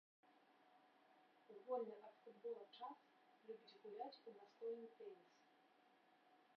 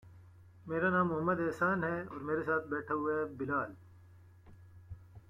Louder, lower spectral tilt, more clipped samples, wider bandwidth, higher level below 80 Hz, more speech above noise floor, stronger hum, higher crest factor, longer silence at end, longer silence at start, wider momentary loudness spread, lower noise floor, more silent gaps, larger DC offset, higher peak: second, -55 LUFS vs -34 LUFS; second, -2.5 dB/octave vs -8.5 dB/octave; neither; second, 6 kHz vs 11 kHz; second, under -90 dBFS vs -66 dBFS; about the same, 22 dB vs 24 dB; neither; about the same, 22 dB vs 18 dB; about the same, 0 s vs 0.1 s; first, 0.25 s vs 0.05 s; about the same, 16 LU vs 17 LU; first, -76 dBFS vs -58 dBFS; neither; neither; second, -36 dBFS vs -18 dBFS